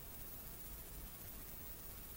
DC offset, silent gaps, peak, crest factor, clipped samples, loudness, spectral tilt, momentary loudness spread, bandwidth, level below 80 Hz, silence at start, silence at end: under 0.1%; none; -34 dBFS; 18 dB; under 0.1%; -49 LUFS; -3.5 dB/octave; 1 LU; 16 kHz; -58 dBFS; 0 s; 0 s